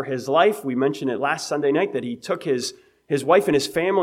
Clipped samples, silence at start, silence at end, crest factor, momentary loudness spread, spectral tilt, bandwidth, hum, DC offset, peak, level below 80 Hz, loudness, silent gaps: under 0.1%; 0 s; 0 s; 16 dB; 9 LU; -4.5 dB/octave; 16 kHz; none; under 0.1%; -4 dBFS; -64 dBFS; -22 LUFS; none